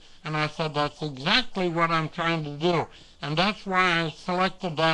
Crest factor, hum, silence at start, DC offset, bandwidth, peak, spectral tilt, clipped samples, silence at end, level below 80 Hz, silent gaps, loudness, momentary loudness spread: 18 dB; none; 0.05 s; under 0.1%; 10 kHz; -8 dBFS; -5 dB/octave; under 0.1%; 0 s; -50 dBFS; none; -25 LUFS; 7 LU